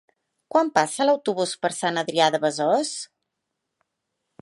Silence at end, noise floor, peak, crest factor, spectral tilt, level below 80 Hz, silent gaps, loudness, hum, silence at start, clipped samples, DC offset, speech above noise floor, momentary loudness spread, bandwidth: 1.35 s; -81 dBFS; -4 dBFS; 22 dB; -3.5 dB/octave; -76 dBFS; none; -23 LUFS; none; 0.5 s; under 0.1%; under 0.1%; 59 dB; 6 LU; 11.5 kHz